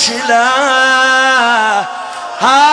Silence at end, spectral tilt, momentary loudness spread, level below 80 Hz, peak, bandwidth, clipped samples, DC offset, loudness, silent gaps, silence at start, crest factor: 0 s; -0.5 dB/octave; 11 LU; -58 dBFS; 0 dBFS; 10.5 kHz; under 0.1%; under 0.1%; -10 LUFS; none; 0 s; 10 dB